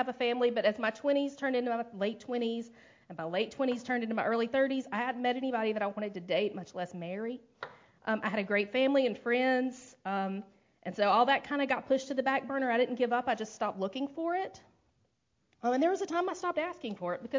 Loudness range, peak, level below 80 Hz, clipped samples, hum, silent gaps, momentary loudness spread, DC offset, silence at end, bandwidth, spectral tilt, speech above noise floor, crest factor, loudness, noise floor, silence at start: 4 LU; -14 dBFS; -76 dBFS; under 0.1%; none; none; 12 LU; under 0.1%; 0 s; 7.6 kHz; -5 dB/octave; 45 dB; 18 dB; -32 LUFS; -76 dBFS; 0 s